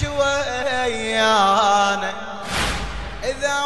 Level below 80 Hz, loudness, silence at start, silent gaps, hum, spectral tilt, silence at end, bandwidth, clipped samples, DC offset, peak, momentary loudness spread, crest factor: -36 dBFS; -20 LUFS; 0 s; none; none; -3 dB/octave; 0 s; 12 kHz; under 0.1%; 1%; -6 dBFS; 12 LU; 16 dB